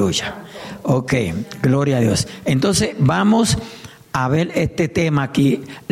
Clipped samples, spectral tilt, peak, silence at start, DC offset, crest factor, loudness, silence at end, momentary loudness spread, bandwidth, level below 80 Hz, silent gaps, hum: under 0.1%; -5.5 dB/octave; -6 dBFS; 0 s; under 0.1%; 12 dB; -18 LUFS; 0.1 s; 11 LU; 15 kHz; -44 dBFS; none; none